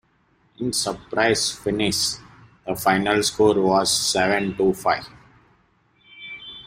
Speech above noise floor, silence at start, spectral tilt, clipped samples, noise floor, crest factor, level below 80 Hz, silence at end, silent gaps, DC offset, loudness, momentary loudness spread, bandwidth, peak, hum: 41 dB; 0.6 s; -3 dB/octave; under 0.1%; -62 dBFS; 20 dB; -52 dBFS; 0.05 s; none; under 0.1%; -21 LUFS; 17 LU; 16 kHz; -2 dBFS; none